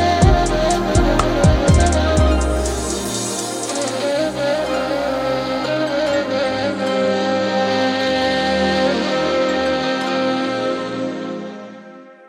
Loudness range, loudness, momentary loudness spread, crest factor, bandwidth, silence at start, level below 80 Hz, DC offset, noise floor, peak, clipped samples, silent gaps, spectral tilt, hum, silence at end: 4 LU; -18 LUFS; 8 LU; 16 dB; 16.5 kHz; 0 s; -26 dBFS; under 0.1%; -39 dBFS; 0 dBFS; under 0.1%; none; -5 dB/octave; none; 0.15 s